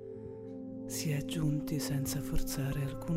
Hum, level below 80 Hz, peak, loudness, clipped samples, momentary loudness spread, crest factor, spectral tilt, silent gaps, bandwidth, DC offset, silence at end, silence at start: none; -44 dBFS; -20 dBFS; -36 LUFS; under 0.1%; 11 LU; 14 dB; -5.5 dB/octave; none; 16 kHz; under 0.1%; 0 s; 0 s